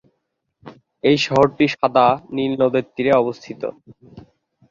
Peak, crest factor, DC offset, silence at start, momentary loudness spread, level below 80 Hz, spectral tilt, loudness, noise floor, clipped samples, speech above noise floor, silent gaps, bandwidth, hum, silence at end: -2 dBFS; 18 dB; under 0.1%; 0.65 s; 14 LU; -56 dBFS; -6 dB/octave; -18 LUFS; -74 dBFS; under 0.1%; 56 dB; none; 7.4 kHz; none; 0.5 s